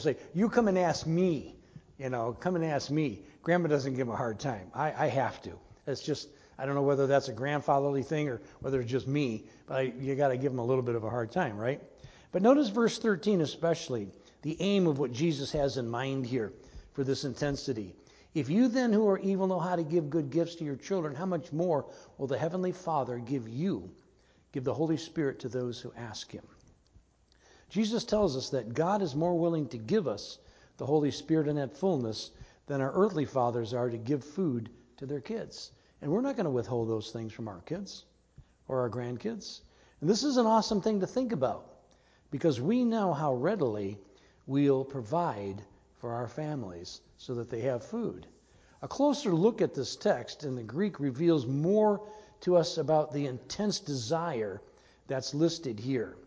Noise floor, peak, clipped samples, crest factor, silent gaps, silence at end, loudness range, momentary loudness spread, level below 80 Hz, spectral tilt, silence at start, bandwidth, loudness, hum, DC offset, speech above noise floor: -65 dBFS; -10 dBFS; under 0.1%; 20 dB; none; 0.05 s; 6 LU; 14 LU; -62 dBFS; -6.5 dB/octave; 0 s; 8 kHz; -31 LUFS; none; under 0.1%; 34 dB